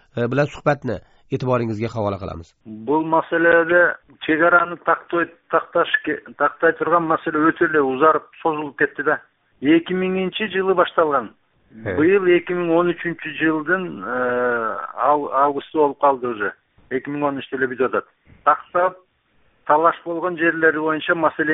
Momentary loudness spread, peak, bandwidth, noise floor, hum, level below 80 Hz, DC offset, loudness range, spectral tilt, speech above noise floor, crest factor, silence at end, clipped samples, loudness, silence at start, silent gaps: 10 LU; 0 dBFS; 7.4 kHz; -61 dBFS; none; -56 dBFS; under 0.1%; 3 LU; -4 dB/octave; 42 dB; 18 dB; 0 s; under 0.1%; -19 LUFS; 0.15 s; none